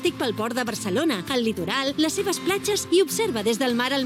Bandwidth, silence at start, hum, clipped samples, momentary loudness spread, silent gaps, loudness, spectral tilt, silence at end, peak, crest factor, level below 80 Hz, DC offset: 17 kHz; 0 s; none; under 0.1%; 5 LU; none; -24 LUFS; -3.5 dB/octave; 0 s; -8 dBFS; 16 dB; -60 dBFS; under 0.1%